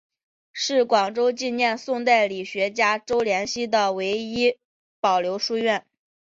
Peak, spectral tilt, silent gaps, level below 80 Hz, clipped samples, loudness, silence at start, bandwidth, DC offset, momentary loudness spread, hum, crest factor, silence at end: -6 dBFS; -3 dB/octave; 4.65-5.03 s; -64 dBFS; under 0.1%; -23 LUFS; 0.55 s; 7.8 kHz; under 0.1%; 6 LU; none; 18 dB; 0.5 s